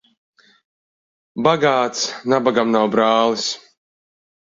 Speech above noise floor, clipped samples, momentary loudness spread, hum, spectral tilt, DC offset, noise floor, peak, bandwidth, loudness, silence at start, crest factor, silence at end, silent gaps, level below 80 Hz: over 73 dB; under 0.1%; 8 LU; none; -4 dB/octave; under 0.1%; under -90 dBFS; -2 dBFS; 7.8 kHz; -18 LUFS; 1.35 s; 18 dB; 1.05 s; none; -64 dBFS